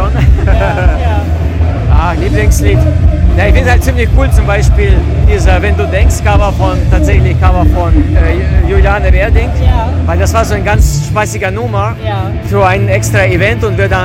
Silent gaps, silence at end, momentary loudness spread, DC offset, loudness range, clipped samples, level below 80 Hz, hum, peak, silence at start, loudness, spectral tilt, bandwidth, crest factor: none; 0 s; 4 LU; under 0.1%; 2 LU; 3%; -10 dBFS; none; 0 dBFS; 0 s; -10 LUFS; -6.5 dB/octave; 15.5 kHz; 8 dB